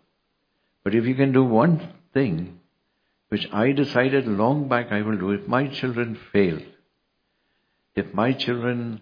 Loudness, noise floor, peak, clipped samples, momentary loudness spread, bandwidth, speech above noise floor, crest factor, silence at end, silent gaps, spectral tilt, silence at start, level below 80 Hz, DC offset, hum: -23 LUFS; -73 dBFS; -4 dBFS; under 0.1%; 10 LU; 5.2 kHz; 51 dB; 20 dB; 0 s; none; -8.5 dB/octave; 0.85 s; -60 dBFS; under 0.1%; none